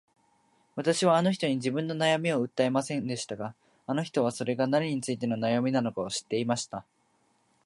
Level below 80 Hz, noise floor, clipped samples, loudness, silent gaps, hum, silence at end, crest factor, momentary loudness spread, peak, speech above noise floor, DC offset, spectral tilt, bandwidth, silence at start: -72 dBFS; -70 dBFS; under 0.1%; -29 LUFS; none; none; 0.85 s; 18 dB; 11 LU; -10 dBFS; 42 dB; under 0.1%; -5 dB/octave; 11.5 kHz; 0.75 s